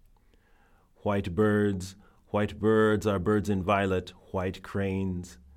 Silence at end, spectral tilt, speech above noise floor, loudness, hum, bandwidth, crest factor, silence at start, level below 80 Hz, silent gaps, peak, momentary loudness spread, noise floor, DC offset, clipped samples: 0.2 s; -7 dB/octave; 34 dB; -28 LUFS; none; 14.5 kHz; 16 dB; 1.05 s; -54 dBFS; none; -12 dBFS; 11 LU; -61 dBFS; under 0.1%; under 0.1%